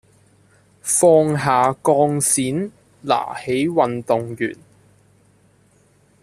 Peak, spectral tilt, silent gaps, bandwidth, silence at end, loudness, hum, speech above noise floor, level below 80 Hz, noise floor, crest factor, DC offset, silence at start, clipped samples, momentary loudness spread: -2 dBFS; -4.5 dB/octave; none; 14 kHz; 1.7 s; -18 LUFS; none; 38 dB; -60 dBFS; -56 dBFS; 18 dB; under 0.1%; 0.85 s; under 0.1%; 13 LU